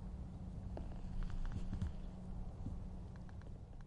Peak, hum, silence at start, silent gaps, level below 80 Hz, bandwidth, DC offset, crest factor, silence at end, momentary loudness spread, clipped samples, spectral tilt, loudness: -30 dBFS; none; 0 s; none; -46 dBFS; 8.6 kHz; under 0.1%; 16 dB; 0 s; 7 LU; under 0.1%; -8 dB/octave; -49 LUFS